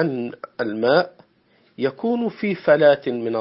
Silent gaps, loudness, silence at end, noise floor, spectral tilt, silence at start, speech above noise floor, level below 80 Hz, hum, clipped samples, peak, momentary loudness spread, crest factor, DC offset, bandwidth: none; -20 LUFS; 0 s; -60 dBFS; -10.5 dB/octave; 0 s; 40 dB; -68 dBFS; none; under 0.1%; -2 dBFS; 13 LU; 18 dB; under 0.1%; 5.8 kHz